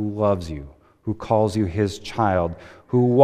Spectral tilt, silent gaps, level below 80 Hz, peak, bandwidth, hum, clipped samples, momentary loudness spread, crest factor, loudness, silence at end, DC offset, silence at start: -7.5 dB/octave; none; -44 dBFS; 0 dBFS; 13.5 kHz; none; under 0.1%; 14 LU; 22 dB; -23 LUFS; 0 s; under 0.1%; 0 s